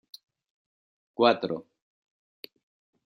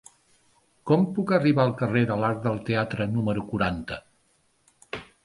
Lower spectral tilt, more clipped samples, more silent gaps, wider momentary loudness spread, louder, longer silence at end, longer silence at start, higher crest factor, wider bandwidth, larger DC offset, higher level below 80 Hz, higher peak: second, -6 dB/octave vs -8 dB/octave; neither; neither; first, 25 LU vs 17 LU; about the same, -26 LUFS vs -25 LUFS; first, 1.45 s vs 0.2 s; first, 1.2 s vs 0.85 s; first, 26 dB vs 18 dB; first, 15.5 kHz vs 11.5 kHz; neither; second, -80 dBFS vs -52 dBFS; about the same, -8 dBFS vs -8 dBFS